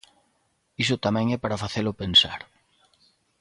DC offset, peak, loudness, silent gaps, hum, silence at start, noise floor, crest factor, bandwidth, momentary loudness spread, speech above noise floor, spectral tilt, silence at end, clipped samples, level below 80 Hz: under 0.1%; -6 dBFS; -23 LUFS; none; none; 0.8 s; -70 dBFS; 22 dB; 11.5 kHz; 10 LU; 46 dB; -4.5 dB/octave; 1 s; under 0.1%; -52 dBFS